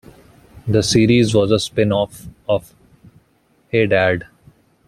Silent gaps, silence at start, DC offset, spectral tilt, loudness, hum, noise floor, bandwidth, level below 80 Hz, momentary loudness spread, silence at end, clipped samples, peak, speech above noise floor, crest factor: none; 0.65 s; under 0.1%; -5.5 dB/octave; -17 LUFS; none; -59 dBFS; 14 kHz; -46 dBFS; 12 LU; 0.65 s; under 0.1%; -2 dBFS; 43 dB; 16 dB